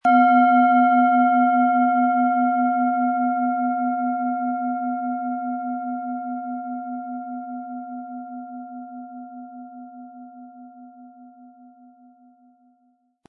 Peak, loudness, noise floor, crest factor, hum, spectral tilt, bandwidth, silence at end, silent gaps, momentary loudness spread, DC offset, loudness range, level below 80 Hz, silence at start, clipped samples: -6 dBFS; -21 LUFS; -65 dBFS; 16 dB; none; -7.5 dB/octave; 4.3 kHz; 1.8 s; none; 23 LU; under 0.1%; 22 LU; -84 dBFS; 0.05 s; under 0.1%